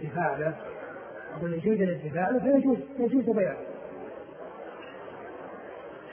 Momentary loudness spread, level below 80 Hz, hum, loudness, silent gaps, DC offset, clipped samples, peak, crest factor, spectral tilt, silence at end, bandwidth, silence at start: 18 LU; -66 dBFS; none; -28 LUFS; none; under 0.1%; under 0.1%; -10 dBFS; 20 dB; -11.5 dB/octave; 0 s; 3.4 kHz; 0 s